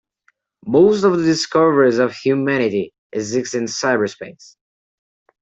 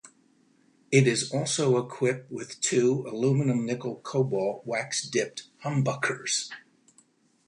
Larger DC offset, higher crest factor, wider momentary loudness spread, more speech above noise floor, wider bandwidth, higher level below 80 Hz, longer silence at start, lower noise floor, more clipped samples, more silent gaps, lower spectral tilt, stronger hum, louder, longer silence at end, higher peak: neither; about the same, 16 dB vs 20 dB; first, 13 LU vs 10 LU; first, 46 dB vs 37 dB; second, 8.2 kHz vs 11 kHz; first, -60 dBFS vs -70 dBFS; first, 0.65 s vs 0.05 s; about the same, -63 dBFS vs -64 dBFS; neither; first, 2.98-3.10 s vs none; about the same, -5 dB/octave vs -4.5 dB/octave; neither; first, -17 LUFS vs -27 LUFS; first, 1.1 s vs 0.85 s; first, -2 dBFS vs -8 dBFS